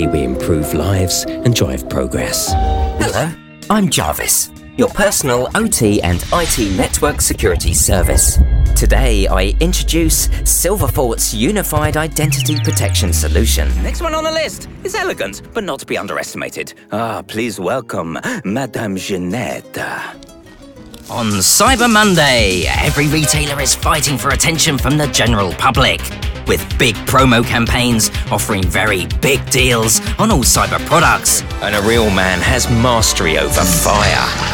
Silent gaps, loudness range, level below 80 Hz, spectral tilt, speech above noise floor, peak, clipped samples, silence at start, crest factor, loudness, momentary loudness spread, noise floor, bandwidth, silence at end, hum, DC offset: none; 9 LU; -22 dBFS; -3.5 dB/octave; 24 dB; 0 dBFS; under 0.1%; 0 s; 14 dB; -14 LUFS; 10 LU; -38 dBFS; 18 kHz; 0 s; none; under 0.1%